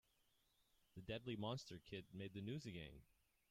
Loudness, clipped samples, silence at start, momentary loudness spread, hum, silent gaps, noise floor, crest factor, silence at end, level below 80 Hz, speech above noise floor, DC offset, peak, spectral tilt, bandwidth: -52 LUFS; under 0.1%; 0.95 s; 12 LU; none; none; -82 dBFS; 18 dB; 0.45 s; -74 dBFS; 30 dB; under 0.1%; -34 dBFS; -6 dB/octave; 16 kHz